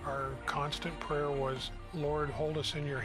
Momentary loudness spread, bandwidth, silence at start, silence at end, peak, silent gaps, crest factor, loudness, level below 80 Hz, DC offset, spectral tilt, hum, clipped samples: 4 LU; 14.5 kHz; 0 s; 0 s; -20 dBFS; none; 16 dB; -36 LUFS; -48 dBFS; under 0.1%; -5 dB/octave; none; under 0.1%